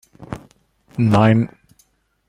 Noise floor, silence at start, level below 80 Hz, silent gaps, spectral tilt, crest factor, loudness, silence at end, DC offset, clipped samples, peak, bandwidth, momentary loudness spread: -60 dBFS; 0.2 s; -48 dBFS; none; -8.5 dB/octave; 18 dB; -17 LUFS; 0.8 s; under 0.1%; under 0.1%; -2 dBFS; 10.5 kHz; 21 LU